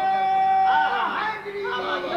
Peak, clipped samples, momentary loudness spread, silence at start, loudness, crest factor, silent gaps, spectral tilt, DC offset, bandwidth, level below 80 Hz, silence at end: -12 dBFS; under 0.1%; 9 LU; 0 s; -22 LUFS; 12 dB; none; -4 dB/octave; under 0.1%; 7 kHz; -60 dBFS; 0 s